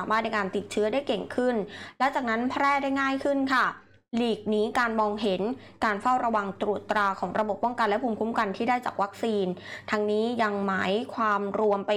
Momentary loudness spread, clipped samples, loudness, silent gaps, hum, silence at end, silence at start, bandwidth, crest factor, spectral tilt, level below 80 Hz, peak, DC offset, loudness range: 5 LU; under 0.1%; -27 LUFS; none; none; 0 s; 0 s; 14.5 kHz; 12 dB; -5.5 dB/octave; -64 dBFS; -14 dBFS; under 0.1%; 1 LU